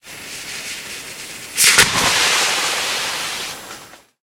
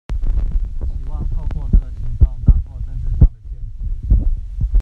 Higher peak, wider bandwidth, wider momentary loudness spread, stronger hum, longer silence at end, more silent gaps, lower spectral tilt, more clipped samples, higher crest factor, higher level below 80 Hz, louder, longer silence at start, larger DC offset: about the same, 0 dBFS vs 0 dBFS; first, 16.5 kHz vs 2.1 kHz; first, 19 LU vs 12 LU; neither; first, 0.25 s vs 0 s; neither; second, 0 dB/octave vs -10.5 dB/octave; neither; about the same, 20 dB vs 16 dB; second, -50 dBFS vs -18 dBFS; first, -15 LUFS vs -21 LUFS; about the same, 0.05 s vs 0.1 s; neither